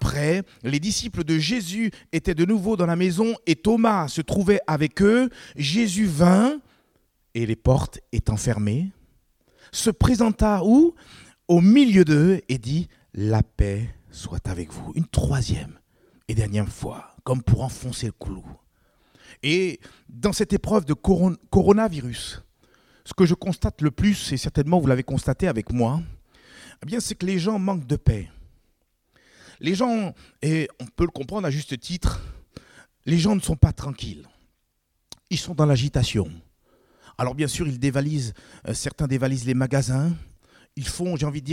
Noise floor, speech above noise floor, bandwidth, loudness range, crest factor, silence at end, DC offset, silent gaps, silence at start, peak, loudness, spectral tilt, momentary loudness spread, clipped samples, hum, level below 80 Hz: -72 dBFS; 50 dB; 15.5 kHz; 7 LU; 22 dB; 0 s; under 0.1%; none; 0 s; 0 dBFS; -23 LUFS; -6 dB/octave; 14 LU; under 0.1%; none; -38 dBFS